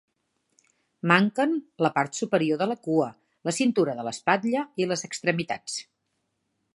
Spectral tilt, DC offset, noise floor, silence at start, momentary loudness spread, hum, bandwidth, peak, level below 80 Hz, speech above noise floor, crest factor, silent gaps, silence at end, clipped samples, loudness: -5 dB/octave; under 0.1%; -77 dBFS; 1.05 s; 10 LU; none; 11.5 kHz; -2 dBFS; -74 dBFS; 52 dB; 24 dB; none; 0.95 s; under 0.1%; -26 LUFS